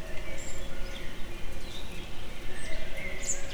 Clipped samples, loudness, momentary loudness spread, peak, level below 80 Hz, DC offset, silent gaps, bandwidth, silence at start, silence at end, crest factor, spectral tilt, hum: under 0.1%; -39 LUFS; 8 LU; -16 dBFS; -38 dBFS; under 0.1%; none; 13 kHz; 0 s; 0 s; 10 dB; -2.5 dB/octave; none